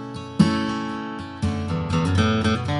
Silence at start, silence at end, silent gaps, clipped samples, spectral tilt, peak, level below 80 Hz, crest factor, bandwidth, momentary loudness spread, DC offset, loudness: 0 s; 0 s; none; under 0.1%; -6.5 dB/octave; -4 dBFS; -36 dBFS; 20 dB; 11.5 kHz; 10 LU; under 0.1%; -23 LUFS